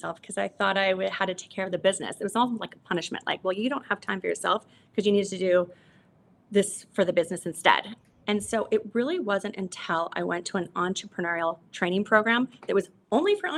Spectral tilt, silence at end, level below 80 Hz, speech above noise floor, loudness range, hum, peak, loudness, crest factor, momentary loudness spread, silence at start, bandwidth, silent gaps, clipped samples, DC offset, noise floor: -4 dB/octave; 0 s; -70 dBFS; 33 dB; 2 LU; none; -2 dBFS; -27 LUFS; 24 dB; 9 LU; 0.05 s; 12.5 kHz; none; under 0.1%; under 0.1%; -60 dBFS